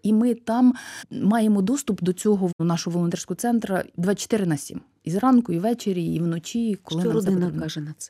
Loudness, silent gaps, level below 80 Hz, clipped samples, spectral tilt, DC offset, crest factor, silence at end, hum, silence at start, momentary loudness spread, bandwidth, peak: -23 LUFS; 2.53-2.59 s; -60 dBFS; under 0.1%; -6 dB/octave; under 0.1%; 14 dB; 0.05 s; none; 0.05 s; 8 LU; 15 kHz; -10 dBFS